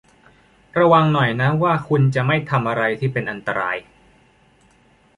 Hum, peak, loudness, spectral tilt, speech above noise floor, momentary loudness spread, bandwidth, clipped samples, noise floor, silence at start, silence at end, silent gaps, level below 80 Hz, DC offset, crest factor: none; -2 dBFS; -19 LUFS; -8 dB/octave; 37 dB; 10 LU; 10.5 kHz; under 0.1%; -55 dBFS; 0.75 s; 1.35 s; none; -54 dBFS; under 0.1%; 18 dB